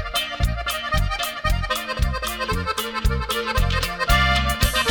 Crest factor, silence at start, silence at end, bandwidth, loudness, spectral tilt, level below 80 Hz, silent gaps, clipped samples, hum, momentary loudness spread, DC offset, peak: 16 dB; 0 s; 0 s; over 20 kHz; -22 LUFS; -3.5 dB/octave; -26 dBFS; none; under 0.1%; none; 6 LU; under 0.1%; -6 dBFS